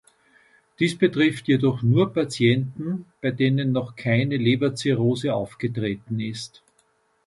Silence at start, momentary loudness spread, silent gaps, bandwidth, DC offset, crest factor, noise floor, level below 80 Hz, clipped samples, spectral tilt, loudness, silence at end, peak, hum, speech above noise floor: 0.8 s; 9 LU; none; 11.5 kHz; under 0.1%; 18 dB; -65 dBFS; -58 dBFS; under 0.1%; -6.5 dB/octave; -23 LUFS; 0.8 s; -4 dBFS; none; 43 dB